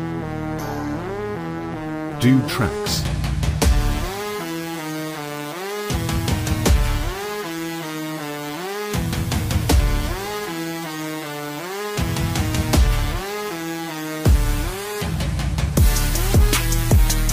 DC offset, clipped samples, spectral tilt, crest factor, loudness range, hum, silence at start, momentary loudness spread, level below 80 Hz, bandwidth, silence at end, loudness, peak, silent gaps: under 0.1%; under 0.1%; -5 dB/octave; 16 dB; 3 LU; none; 0 s; 10 LU; -24 dBFS; 16 kHz; 0 s; -22 LUFS; -4 dBFS; none